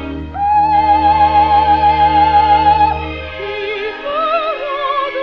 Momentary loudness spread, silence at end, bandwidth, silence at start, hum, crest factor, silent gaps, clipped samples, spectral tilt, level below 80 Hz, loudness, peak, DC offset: 11 LU; 0 s; 5.8 kHz; 0 s; none; 12 dB; none; under 0.1%; -3 dB/octave; -32 dBFS; -13 LUFS; 0 dBFS; under 0.1%